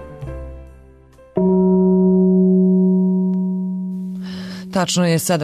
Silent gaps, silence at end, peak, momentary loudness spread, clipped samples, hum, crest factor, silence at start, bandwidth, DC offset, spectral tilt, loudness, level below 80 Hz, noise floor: none; 0 s; -6 dBFS; 17 LU; under 0.1%; none; 10 dB; 0 s; 13.5 kHz; under 0.1%; -6.5 dB/octave; -17 LUFS; -42 dBFS; -45 dBFS